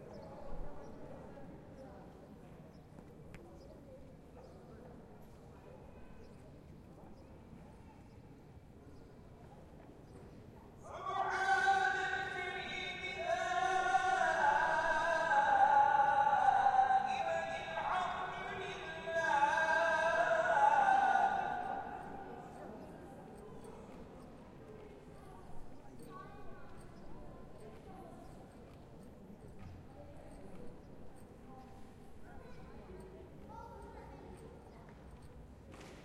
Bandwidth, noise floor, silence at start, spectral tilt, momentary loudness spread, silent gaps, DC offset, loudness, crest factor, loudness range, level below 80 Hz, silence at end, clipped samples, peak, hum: 11.5 kHz; -57 dBFS; 0 s; -4 dB/octave; 26 LU; none; under 0.1%; -33 LUFS; 20 dB; 25 LU; -60 dBFS; 0 s; under 0.1%; -18 dBFS; none